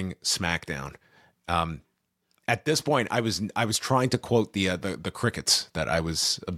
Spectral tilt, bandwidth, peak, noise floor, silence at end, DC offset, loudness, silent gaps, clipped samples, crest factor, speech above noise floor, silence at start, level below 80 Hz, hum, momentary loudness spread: -3.5 dB/octave; 16 kHz; -8 dBFS; -74 dBFS; 0 s; under 0.1%; -26 LUFS; none; under 0.1%; 20 dB; 47 dB; 0 s; -50 dBFS; none; 11 LU